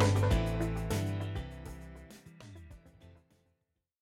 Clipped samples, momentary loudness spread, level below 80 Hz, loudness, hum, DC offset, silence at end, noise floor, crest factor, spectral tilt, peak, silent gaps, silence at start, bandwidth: under 0.1%; 23 LU; -42 dBFS; -33 LUFS; none; under 0.1%; 0.9 s; -82 dBFS; 20 dB; -6.5 dB/octave; -14 dBFS; none; 0 s; 15.5 kHz